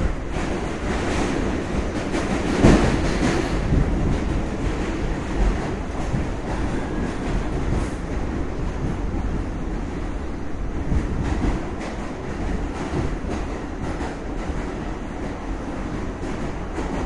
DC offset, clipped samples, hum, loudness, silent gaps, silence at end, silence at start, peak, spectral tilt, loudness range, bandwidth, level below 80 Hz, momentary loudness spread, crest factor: under 0.1%; under 0.1%; none; -25 LUFS; none; 0 s; 0 s; -2 dBFS; -6.5 dB/octave; 7 LU; 11.5 kHz; -28 dBFS; 8 LU; 22 dB